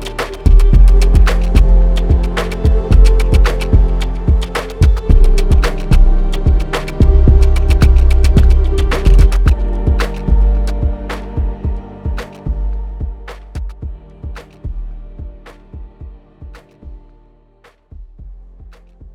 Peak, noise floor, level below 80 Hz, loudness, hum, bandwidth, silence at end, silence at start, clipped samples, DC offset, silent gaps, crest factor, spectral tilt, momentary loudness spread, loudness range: 0 dBFS; -49 dBFS; -12 dBFS; -14 LUFS; none; 11.5 kHz; 0.05 s; 0 s; under 0.1%; under 0.1%; none; 12 dB; -7 dB/octave; 19 LU; 19 LU